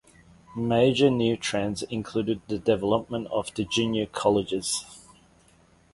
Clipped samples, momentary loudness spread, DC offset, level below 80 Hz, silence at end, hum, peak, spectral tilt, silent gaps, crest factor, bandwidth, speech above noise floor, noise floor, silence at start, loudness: under 0.1%; 9 LU; under 0.1%; -56 dBFS; 0.95 s; none; -8 dBFS; -5 dB/octave; none; 18 dB; 11.5 kHz; 34 dB; -59 dBFS; 0.5 s; -26 LUFS